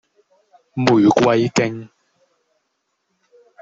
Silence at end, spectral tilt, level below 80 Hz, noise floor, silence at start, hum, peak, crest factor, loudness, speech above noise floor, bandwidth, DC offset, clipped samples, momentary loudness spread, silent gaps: 1.75 s; -6 dB/octave; -58 dBFS; -72 dBFS; 0.75 s; none; -2 dBFS; 18 dB; -16 LUFS; 57 dB; 7.8 kHz; under 0.1%; under 0.1%; 16 LU; none